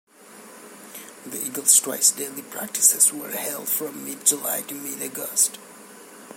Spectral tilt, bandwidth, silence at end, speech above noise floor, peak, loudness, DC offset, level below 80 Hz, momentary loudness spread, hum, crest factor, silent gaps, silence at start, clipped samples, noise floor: 0 dB/octave; 17 kHz; 0 s; 22 dB; -2 dBFS; -20 LUFS; under 0.1%; -82 dBFS; 19 LU; none; 24 dB; none; 0.2 s; under 0.1%; -46 dBFS